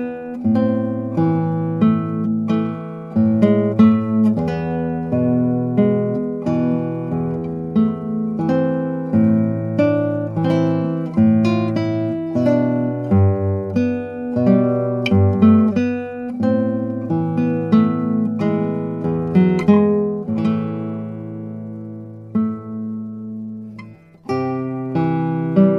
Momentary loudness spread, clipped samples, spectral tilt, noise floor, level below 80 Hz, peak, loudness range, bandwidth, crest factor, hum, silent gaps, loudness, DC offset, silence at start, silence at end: 12 LU; under 0.1%; -10 dB/octave; -39 dBFS; -54 dBFS; 0 dBFS; 7 LU; 6.6 kHz; 16 dB; none; none; -18 LUFS; under 0.1%; 0 s; 0 s